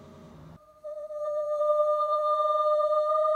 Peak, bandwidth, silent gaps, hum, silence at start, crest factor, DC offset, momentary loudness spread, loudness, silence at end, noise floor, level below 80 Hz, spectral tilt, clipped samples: -14 dBFS; 8.4 kHz; none; none; 0 s; 12 dB; under 0.1%; 15 LU; -26 LUFS; 0 s; -50 dBFS; -68 dBFS; -5 dB/octave; under 0.1%